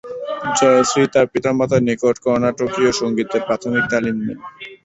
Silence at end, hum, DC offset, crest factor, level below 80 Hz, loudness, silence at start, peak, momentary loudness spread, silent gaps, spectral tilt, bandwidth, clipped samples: 0.1 s; none; under 0.1%; 16 dB; -52 dBFS; -17 LUFS; 0.05 s; -2 dBFS; 11 LU; none; -4.5 dB/octave; 8.4 kHz; under 0.1%